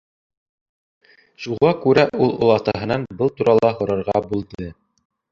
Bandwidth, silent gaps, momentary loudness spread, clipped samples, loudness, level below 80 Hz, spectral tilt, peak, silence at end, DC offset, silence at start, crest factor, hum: 7.2 kHz; none; 15 LU; under 0.1%; -19 LUFS; -50 dBFS; -7.5 dB/octave; -2 dBFS; 0.6 s; under 0.1%; 1.4 s; 20 dB; none